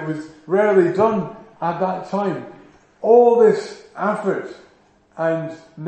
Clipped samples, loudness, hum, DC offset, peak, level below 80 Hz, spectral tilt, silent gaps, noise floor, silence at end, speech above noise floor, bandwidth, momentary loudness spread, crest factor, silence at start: under 0.1%; -18 LUFS; none; under 0.1%; -2 dBFS; -64 dBFS; -7.5 dB/octave; none; -55 dBFS; 0 s; 37 dB; 8.8 kHz; 17 LU; 18 dB; 0 s